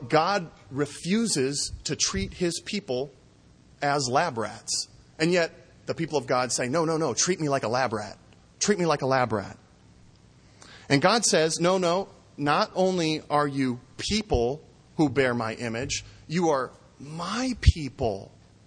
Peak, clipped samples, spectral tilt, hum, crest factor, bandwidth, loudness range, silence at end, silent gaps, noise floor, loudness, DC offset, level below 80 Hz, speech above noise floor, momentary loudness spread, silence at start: -4 dBFS; under 0.1%; -4 dB/octave; none; 22 dB; 10.5 kHz; 4 LU; 0.4 s; none; -56 dBFS; -26 LUFS; under 0.1%; -40 dBFS; 30 dB; 10 LU; 0 s